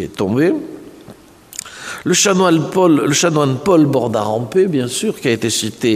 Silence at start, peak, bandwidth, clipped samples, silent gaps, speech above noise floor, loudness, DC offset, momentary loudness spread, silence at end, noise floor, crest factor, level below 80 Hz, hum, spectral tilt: 0 s; -2 dBFS; 15.5 kHz; under 0.1%; none; 26 dB; -15 LUFS; under 0.1%; 16 LU; 0 s; -41 dBFS; 14 dB; -54 dBFS; none; -4.5 dB/octave